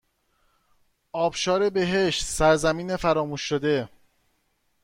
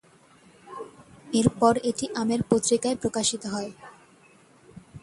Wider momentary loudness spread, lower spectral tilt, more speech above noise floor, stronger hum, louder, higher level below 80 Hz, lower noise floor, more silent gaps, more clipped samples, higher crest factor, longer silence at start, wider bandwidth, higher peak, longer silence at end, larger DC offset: second, 7 LU vs 20 LU; about the same, -4 dB/octave vs -4.5 dB/octave; first, 47 dB vs 32 dB; neither; about the same, -24 LUFS vs -25 LUFS; first, -46 dBFS vs -58 dBFS; first, -70 dBFS vs -56 dBFS; neither; neither; about the same, 18 dB vs 22 dB; first, 1.15 s vs 0.65 s; first, 16.5 kHz vs 11.5 kHz; about the same, -8 dBFS vs -6 dBFS; first, 0.95 s vs 0.05 s; neither